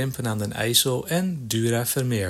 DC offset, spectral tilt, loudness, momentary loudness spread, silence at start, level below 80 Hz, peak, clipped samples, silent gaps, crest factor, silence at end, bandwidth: under 0.1%; -4 dB/octave; -23 LUFS; 7 LU; 0 s; -58 dBFS; -4 dBFS; under 0.1%; none; 20 dB; 0 s; 18.5 kHz